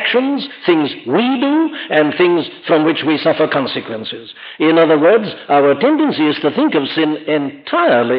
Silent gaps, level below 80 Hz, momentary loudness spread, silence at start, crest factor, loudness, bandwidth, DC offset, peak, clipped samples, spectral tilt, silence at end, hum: none; -70 dBFS; 8 LU; 0 s; 12 dB; -14 LUFS; 5.2 kHz; under 0.1%; -2 dBFS; under 0.1%; -9 dB/octave; 0 s; none